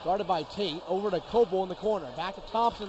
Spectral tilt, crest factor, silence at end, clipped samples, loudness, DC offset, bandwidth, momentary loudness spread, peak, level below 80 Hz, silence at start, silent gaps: -6 dB/octave; 16 dB; 0 s; under 0.1%; -30 LUFS; under 0.1%; 8.2 kHz; 6 LU; -14 dBFS; -54 dBFS; 0 s; none